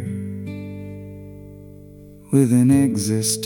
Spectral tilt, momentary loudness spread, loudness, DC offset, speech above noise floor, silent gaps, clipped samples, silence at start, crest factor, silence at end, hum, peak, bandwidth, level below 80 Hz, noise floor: -5.5 dB/octave; 24 LU; -19 LUFS; under 0.1%; 26 dB; none; under 0.1%; 0 s; 18 dB; 0 s; 50 Hz at -55 dBFS; -4 dBFS; 18 kHz; -54 dBFS; -42 dBFS